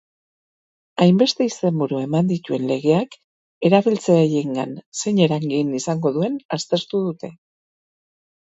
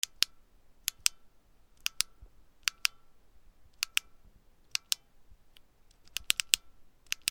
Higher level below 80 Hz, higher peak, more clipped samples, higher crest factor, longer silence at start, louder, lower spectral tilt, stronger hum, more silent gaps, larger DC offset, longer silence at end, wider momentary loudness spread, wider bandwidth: about the same, -66 dBFS vs -64 dBFS; about the same, -2 dBFS vs 0 dBFS; neither; second, 20 dB vs 38 dB; first, 1 s vs 0.2 s; first, -20 LUFS vs -33 LUFS; first, -6 dB/octave vs 3.5 dB/octave; neither; first, 3.24-3.61 s, 4.86-4.92 s, 6.45-6.49 s vs none; neither; first, 1.1 s vs 0.5 s; about the same, 10 LU vs 8 LU; second, 8 kHz vs over 20 kHz